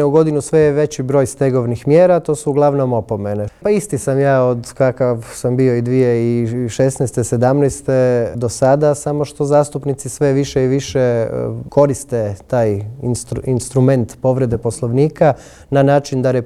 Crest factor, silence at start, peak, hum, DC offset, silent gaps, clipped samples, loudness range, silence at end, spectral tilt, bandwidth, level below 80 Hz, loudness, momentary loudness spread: 14 dB; 0 s; 0 dBFS; none; under 0.1%; none; under 0.1%; 2 LU; 0 s; -7 dB/octave; 13.5 kHz; -44 dBFS; -16 LUFS; 7 LU